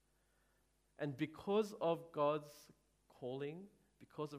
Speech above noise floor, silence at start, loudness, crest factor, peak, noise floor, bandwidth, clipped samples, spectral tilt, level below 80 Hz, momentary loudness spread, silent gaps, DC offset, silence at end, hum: 37 dB; 1 s; -42 LUFS; 20 dB; -24 dBFS; -78 dBFS; 15.5 kHz; under 0.1%; -6.5 dB/octave; -80 dBFS; 19 LU; none; under 0.1%; 0 s; none